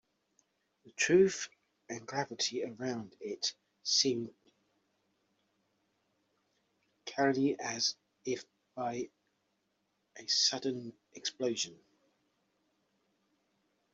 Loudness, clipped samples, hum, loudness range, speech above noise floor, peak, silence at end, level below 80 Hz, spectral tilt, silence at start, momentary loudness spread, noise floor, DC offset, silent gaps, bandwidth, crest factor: -33 LUFS; under 0.1%; none; 5 LU; 46 dB; -14 dBFS; 2.2 s; -80 dBFS; -2.5 dB/octave; 0.85 s; 17 LU; -80 dBFS; under 0.1%; none; 8.2 kHz; 24 dB